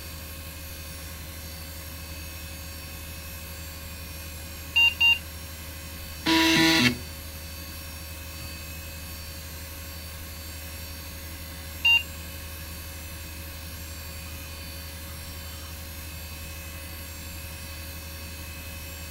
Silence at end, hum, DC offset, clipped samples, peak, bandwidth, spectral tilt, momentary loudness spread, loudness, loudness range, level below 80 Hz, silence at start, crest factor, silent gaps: 0 s; none; under 0.1%; under 0.1%; -6 dBFS; 16 kHz; -3 dB/octave; 18 LU; -29 LUFS; 15 LU; -44 dBFS; 0 s; 26 dB; none